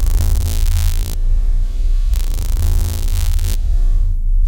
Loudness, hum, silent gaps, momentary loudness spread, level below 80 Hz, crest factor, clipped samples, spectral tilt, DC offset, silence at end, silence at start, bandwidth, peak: -20 LUFS; none; none; 3 LU; -14 dBFS; 12 dB; under 0.1%; -4.5 dB/octave; under 0.1%; 0 s; 0 s; 17 kHz; -2 dBFS